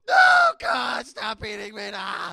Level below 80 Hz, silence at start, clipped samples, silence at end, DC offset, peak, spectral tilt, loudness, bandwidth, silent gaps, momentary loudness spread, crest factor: -58 dBFS; 0.05 s; under 0.1%; 0 s; under 0.1%; -4 dBFS; -2 dB/octave; -21 LUFS; 13 kHz; none; 17 LU; 18 dB